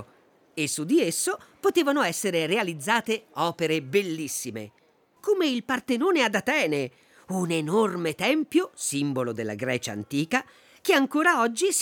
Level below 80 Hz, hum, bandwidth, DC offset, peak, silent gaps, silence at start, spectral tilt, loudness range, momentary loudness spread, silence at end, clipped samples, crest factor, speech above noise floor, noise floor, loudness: -74 dBFS; none; over 20 kHz; under 0.1%; -8 dBFS; none; 0 s; -3.5 dB/octave; 2 LU; 8 LU; 0 s; under 0.1%; 18 dB; 34 dB; -59 dBFS; -25 LUFS